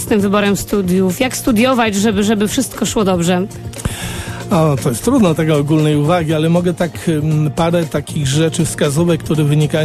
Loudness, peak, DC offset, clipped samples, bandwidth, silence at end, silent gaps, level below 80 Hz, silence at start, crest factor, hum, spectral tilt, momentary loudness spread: -15 LUFS; -2 dBFS; under 0.1%; under 0.1%; 14 kHz; 0 s; none; -38 dBFS; 0 s; 12 dB; none; -5.5 dB/octave; 6 LU